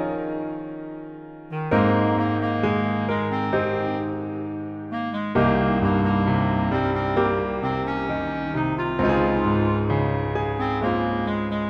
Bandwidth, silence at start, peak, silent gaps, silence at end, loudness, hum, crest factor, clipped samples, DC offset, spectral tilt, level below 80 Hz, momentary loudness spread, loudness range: 6.6 kHz; 0 s; -6 dBFS; none; 0 s; -23 LUFS; none; 16 dB; under 0.1%; under 0.1%; -9 dB/octave; -42 dBFS; 11 LU; 2 LU